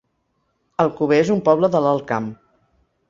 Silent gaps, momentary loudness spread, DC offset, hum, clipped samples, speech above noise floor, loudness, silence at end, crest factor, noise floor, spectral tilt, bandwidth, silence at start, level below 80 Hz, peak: none; 10 LU; under 0.1%; none; under 0.1%; 52 dB; -18 LUFS; 0.75 s; 18 dB; -69 dBFS; -7 dB/octave; 7.6 kHz; 0.8 s; -60 dBFS; -2 dBFS